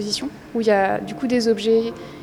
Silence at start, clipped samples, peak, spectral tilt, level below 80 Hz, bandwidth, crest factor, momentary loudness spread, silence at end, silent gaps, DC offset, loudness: 0 s; under 0.1%; -6 dBFS; -4.5 dB/octave; -54 dBFS; 13.5 kHz; 16 dB; 8 LU; 0 s; none; under 0.1%; -21 LUFS